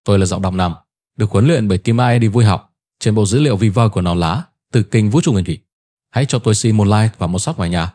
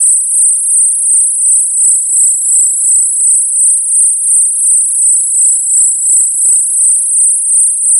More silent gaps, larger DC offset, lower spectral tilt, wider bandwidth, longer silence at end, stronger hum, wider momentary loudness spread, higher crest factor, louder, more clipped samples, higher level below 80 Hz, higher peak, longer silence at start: first, 5.73-5.97 s vs none; neither; first, -6 dB/octave vs 6.5 dB/octave; about the same, 11 kHz vs 11.5 kHz; about the same, 0.05 s vs 0 s; neither; first, 8 LU vs 1 LU; first, 14 dB vs 8 dB; second, -15 LUFS vs -6 LUFS; neither; first, -40 dBFS vs -88 dBFS; about the same, 0 dBFS vs -2 dBFS; about the same, 0.05 s vs 0 s